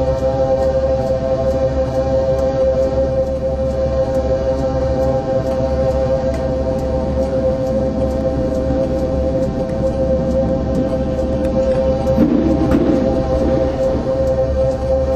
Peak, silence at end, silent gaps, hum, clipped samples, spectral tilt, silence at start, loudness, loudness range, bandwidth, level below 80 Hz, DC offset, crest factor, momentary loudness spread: -2 dBFS; 0 s; none; none; under 0.1%; -8.5 dB/octave; 0 s; -17 LUFS; 2 LU; 8.6 kHz; -24 dBFS; under 0.1%; 14 dB; 4 LU